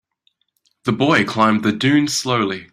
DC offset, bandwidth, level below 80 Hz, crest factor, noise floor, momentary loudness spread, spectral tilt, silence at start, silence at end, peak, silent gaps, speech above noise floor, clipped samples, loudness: under 0.1%; 15 kHz; -56 dBFS; 16 dB; -66 dBFS; 5 LU; -4.5 dB/octave; 0.85 s; 0.1 s; -2 dBFS; none; 49 dB; under 0.1%; -17 LUFS